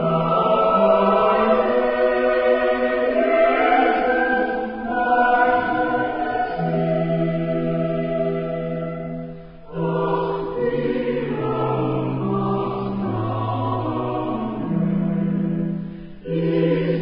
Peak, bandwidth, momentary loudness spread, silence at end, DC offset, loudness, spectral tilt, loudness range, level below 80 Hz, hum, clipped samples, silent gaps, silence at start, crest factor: -4 dBFS; 5.4 kHz; 9 LU; 0 s; under 0.1%; -21 LUFS; -12 dB/octave; 6 LU; -48 dBFS; none; under 0.1%; none; 0 s; 16 dB